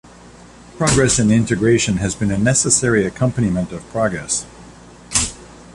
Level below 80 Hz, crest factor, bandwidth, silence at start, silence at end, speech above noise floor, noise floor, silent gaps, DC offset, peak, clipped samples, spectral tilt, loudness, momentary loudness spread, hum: -38 dBFS; 16 dB; 11.5 kHz; 0.25 s; 0.05 s; 25 dB; -42 dBFS; none; under 0.1%; -2 dBFS; under 0.1%; -4.5 dB/octave; -17 LUFS; 8 LU; none